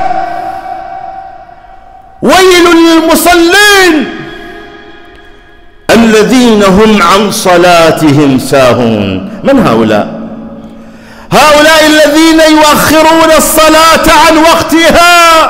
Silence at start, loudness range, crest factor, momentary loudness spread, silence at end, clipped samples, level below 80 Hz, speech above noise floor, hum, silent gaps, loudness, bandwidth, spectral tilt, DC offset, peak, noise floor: 0 s; 5 LU; 6 dB; 17 LU; 0 s; 0.6%; -30 dBFS; 30 dB; none; none; -4 LUFS; 16.5 kHz; -3.5 dB/octave; under 0.1%; 0 dBFS; -34 dBFS